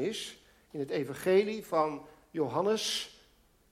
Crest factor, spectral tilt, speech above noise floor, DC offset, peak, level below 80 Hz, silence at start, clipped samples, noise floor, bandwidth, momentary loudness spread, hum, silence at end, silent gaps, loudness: 18 dB; -4 dB/octave; 34 dB; under 0.1%; -14 dBFS; -70 dBFS; 0 s; under 0.1%; -65 dBFS; 16 kHz; 16 LU; none; 0.6 s; none; -32 LUFS